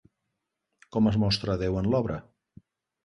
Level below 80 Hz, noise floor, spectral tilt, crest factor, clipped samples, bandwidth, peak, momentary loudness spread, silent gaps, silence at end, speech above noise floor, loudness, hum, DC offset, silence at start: -48 dBFS; -82 dBFS; -7 dB/octave; 18 dB; under 0.1%; 11 kHz; -12 dBFS; 10 LU; none; 0.85 s; 57 dB; -27 LUFS; none; under 0.1%; 0.95 s